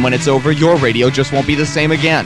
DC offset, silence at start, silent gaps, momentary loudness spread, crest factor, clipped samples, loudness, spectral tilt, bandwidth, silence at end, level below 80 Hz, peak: under 0.1%; 0 s; none; 3 LU; 12 dB; under 0.1%; -13 LUFS; -5.5 dB/octave; 12 kHz; 0 s; -38 dBFS; 0 dBFS